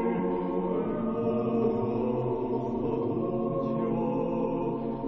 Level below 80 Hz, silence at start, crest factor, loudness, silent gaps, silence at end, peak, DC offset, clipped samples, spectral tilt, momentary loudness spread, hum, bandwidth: -50 dBFS; 0 s; 12 dB; -29 LUFS; none; 0 s; -16 dBFS; under 0.1%; under 0.1%; -11 dB/octave; 3 LU; none; 5.8 kHz